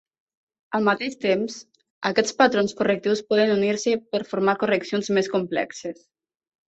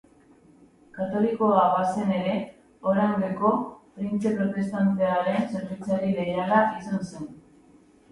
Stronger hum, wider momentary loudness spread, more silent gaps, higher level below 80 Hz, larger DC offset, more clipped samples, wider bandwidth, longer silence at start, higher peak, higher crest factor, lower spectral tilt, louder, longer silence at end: neither; about the same, 10 LU vs 12 LU; first, 1.90-2.01 s vs none; about the same, -66 dBFS vs -62 dBFS; neither; neither; second, 8.2 kHz vs 11.5 kHz; second, 0.7 s vs 0.95 s; first, -2 dBFS vs -8 dBFS; about the same, 20 dB vs 18 dB; second, -4.5 dB/octave vs -7.5 dB/octave; about the same, -23 LUFS vs -25 LUFS; about the same, 0.75 s vs 0.75 s